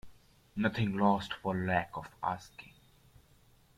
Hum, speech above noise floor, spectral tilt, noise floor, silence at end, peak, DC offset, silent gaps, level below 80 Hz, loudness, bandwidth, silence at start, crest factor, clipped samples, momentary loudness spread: none; 32 dB; -7 dB/octave; -64 dBFS; 1.1 s; -14 dBFS; under 0.1%; none; -64 dBFS; -33 LUFS; 14.5 kHz; 0.05 s; 22 dB; under 0.1%; 15 LU